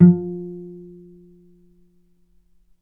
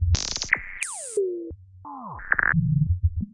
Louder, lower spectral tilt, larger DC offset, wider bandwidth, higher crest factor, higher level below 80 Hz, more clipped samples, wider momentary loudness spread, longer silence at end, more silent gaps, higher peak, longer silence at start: first, -21 LUFS vs -25 LUFS; first, -14.5 dB/octave vs -4.5 dB/octave; neither; second, 2.1 kHz vs 11.5 kHz; about the same, 22 dB vs 22 dB; second, -62 dBFS vs -36 dBFS; neither; first, 25 LU vs 18 LU; first, 2.1 s vs 0.05 s; neither; first, 0 dBFS vs -4 dBFS; about the same, 0 s vs 0 s